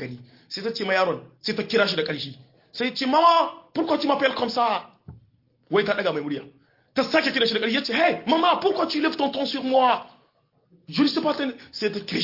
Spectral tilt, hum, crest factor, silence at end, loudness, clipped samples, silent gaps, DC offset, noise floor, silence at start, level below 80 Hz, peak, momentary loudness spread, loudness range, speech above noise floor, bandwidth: -5 dB/octave; none; 20 dB; 0 s; -23 LUFS; under 0.1%; none; under 0.1%; -65 dBFS; 0 s; -68 dBFS; -4 dBFS; 10 LU; 3 LU; 42 dB; 5.8 kHz